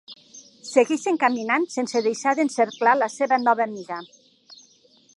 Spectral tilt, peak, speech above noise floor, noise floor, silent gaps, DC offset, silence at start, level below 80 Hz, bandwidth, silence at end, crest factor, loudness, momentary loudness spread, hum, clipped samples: -3.5 dB/octave; -4 dBFS; 35 dB; -57 dBFS; none; under 0.1%; 0.1 s; -80 dBFS; 11.5 kHz; 1.15 s; 20 dB; -22 LUFS; 15 LU; none; under 0.1%